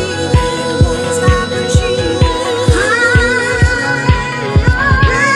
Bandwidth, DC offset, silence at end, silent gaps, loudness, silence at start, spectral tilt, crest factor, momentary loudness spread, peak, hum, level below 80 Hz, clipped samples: 12.5 kHz; under 0.1%; 0 s; none; -12 LUFS; 0 s; -5 dB/octave; 12 dB; 4 LU; 0 dBFS; none; -20 dBFS; under 0.1%